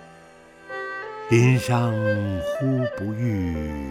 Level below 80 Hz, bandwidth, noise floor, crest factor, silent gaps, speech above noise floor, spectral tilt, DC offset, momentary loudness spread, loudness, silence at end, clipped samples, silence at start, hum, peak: -44 dBFS; 14 kHz; -48 dBFS; 18 dB; none; 26 dB; -7 dB/octave; under 0.1%; 13 LU; -23 LUFS; 0 s; under 0.1%; 0 s; none; -6 dBFS